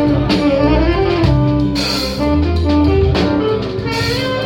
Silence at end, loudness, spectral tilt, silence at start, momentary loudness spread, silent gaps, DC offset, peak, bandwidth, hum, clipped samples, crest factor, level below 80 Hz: 0 s; -14 LUFS; -6.5 dB/octave; 0 s; 4 LU; none; under 0.1%; -2 dBFS; 16.5 kHz; none; under 0.1%; 12 dB; -24 dBFS